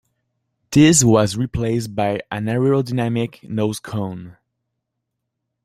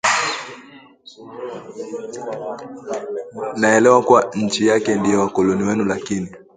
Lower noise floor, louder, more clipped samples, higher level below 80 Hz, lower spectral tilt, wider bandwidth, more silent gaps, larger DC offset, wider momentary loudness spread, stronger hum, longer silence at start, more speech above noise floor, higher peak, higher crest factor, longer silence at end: first, -78 dBFS vs -44 dBFS; about the same, -18 LUFS vs -18 LUFS; neither; first, -48 dBFS vs -56 dBFS; about the same, -5 dB/octave vs -4.5 dB/octave; first, 16 kHz vs 9.6 kHz; neither; neither; second, 14 LU vs 19 LU; neither; first, 0.7 s vs 0.05 s; first, 60 dB vs 25 dB; about the same, -2 dBFS vs 0 dBFS; about the same, 18 dB vs 18 dB; first, 1.3 s vs 0.15 s